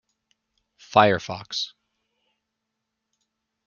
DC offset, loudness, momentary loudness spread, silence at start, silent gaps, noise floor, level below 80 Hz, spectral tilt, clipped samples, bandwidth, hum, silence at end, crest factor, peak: under 0.1%; -22 LUFS; 12 LU; 0.95 s; none; -81 dBFS; -64 dBFS; -4.5 dB/octave; under 0.1%; 7.2 kHz; none; 2 s; 26 dB; -2 dBFS